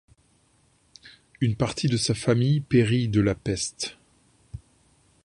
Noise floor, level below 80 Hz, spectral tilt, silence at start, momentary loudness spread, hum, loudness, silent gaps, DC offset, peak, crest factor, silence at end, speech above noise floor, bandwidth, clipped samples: -64 dBFS; -50 dBFS; -5.5 dB/octave; 1.05 s; 22 LU; none; -24 LUFS; none; under 0.1%; -6 dBFS; 20 dB; 0.65 s; 40 dB; 11 kHz; under 0.1%